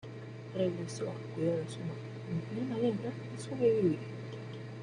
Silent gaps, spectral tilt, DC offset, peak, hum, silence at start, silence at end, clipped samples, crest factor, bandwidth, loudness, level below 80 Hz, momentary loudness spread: none; -7 dB/octave; under 0.1%; -18 dBFS; none; 0 s; 0 s; under 0.1%; 18 dB; 10.5 kHz; -35 LUFS; -70 dBFS; 13 LU